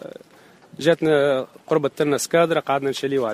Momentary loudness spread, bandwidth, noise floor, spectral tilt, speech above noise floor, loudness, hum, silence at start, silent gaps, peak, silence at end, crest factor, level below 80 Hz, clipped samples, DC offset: 5 LU; 15.5 kHz; -50 dBFS; -4.5 dB/octave; 30 dB; -21 LUFS; none; 0.05 s; none; -4 dBFS; 0 s; 18 dB; -64 dBFS; under 0.1%; under 0.1%